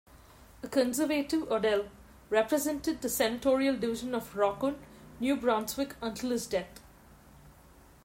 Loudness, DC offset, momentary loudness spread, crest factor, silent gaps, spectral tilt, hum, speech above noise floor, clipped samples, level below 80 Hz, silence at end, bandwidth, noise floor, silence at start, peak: -31 LUFS; under 0.1%; 8 LU; 18 dB; none; -3.5 dB/octave; none; 27 dB; under 0.1%; -58 dBFS; 0.55 s; 16 kHz; -57 dBFS; 0.15 s; -14 dBFS